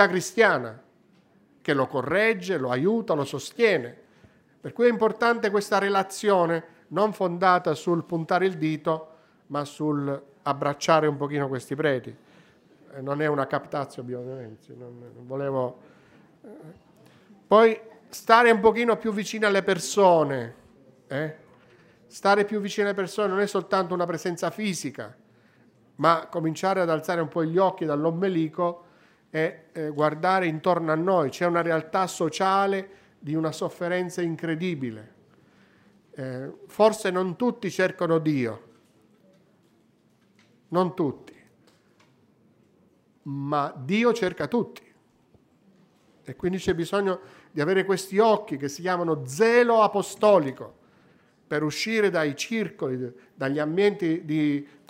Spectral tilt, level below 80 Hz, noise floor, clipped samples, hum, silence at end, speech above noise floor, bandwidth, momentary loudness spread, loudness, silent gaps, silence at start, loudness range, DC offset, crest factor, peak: -5.5 dB/octave; -68 dBFS; -63 dBFS; under 0.1%; none; 0.25 s; 38 dB; 16 kHz; 14 LU; -25 LUFS; none; 0 s; 9 LU; under 0.1%; 24 dB; -2 dBFS